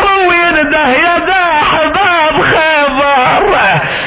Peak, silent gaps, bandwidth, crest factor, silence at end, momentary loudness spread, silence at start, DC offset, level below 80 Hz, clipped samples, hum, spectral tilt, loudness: 0 dBFS; none; 4 kHz; 10 dB; 0 s; 2 LU; 0 s; under 0.1%; -34 dBFS; under 0.1%; none; -8 dB/octave; -8 LUFS